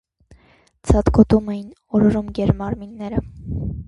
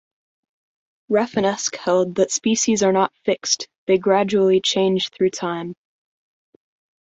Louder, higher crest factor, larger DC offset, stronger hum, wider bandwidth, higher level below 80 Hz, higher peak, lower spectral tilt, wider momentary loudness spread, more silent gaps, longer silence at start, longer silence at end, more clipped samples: about the same, -19 LUFS vs -19 LUFS; about the same, 20 dB vs 18 dB; neither; neither; first, 11 kHz vs 8 kHz; first, -30 dBFS vs -62 dBFS; first, 0 dBFS vs -4 dBFS; first, -8.5 dB/octave vs -3.5 dB/octave; first, 15 LU vs 6 LU; second, none vs 3.78-3.87 s; second, 0.85 s vs 1.1 s; second, 0.05 s vs 1.3 s; neither